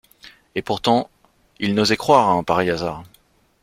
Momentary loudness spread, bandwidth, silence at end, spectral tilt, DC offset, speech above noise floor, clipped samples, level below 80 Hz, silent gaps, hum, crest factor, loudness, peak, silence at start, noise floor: 15 LU; 16 kHz; 0.6 s; -5 dB/octave; under 0.1%; 39 dB; under 0.1%; -52 dBFS; none; none; 20 dB; -19 LUFS; 0 dBFS; 0.25 s; -58 dBFS